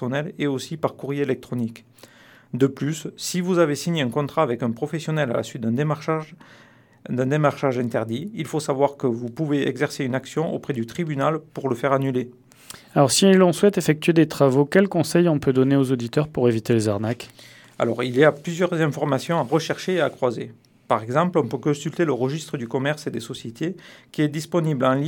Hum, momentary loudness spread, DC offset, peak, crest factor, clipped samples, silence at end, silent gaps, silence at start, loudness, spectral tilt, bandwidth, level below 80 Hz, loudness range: none; 11 LU; under 0.1%; -2 dBFS; 20 dB; under 0.1%; 0 s; none; 0 s; -22 LUFS; -6 dB/octave; 19 kHz; -64 dBFS; 6 LU